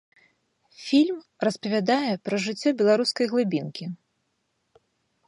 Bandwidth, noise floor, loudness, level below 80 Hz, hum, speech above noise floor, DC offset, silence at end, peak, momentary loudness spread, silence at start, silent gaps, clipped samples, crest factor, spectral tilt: 11.5 kHz; -75 dBFS; -24 LUFS; -76 dBFS; none; 51 dB; under 0.1%; 1.3 s; -10 dBFS; 15 LU; 0.8 s; none; under 0.1%; 16 dB; -5 dB/octave